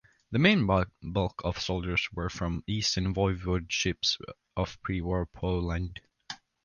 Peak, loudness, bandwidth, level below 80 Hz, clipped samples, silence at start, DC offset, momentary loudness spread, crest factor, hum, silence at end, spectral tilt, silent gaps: -10 dBFS; -30 LUFS; 9.6 kHz; -42 dBFS; under 0.1%; 0.3 s; under 0.1%; 10 LU; 20 dB; none; 0.3 s; -5 dB/octave; none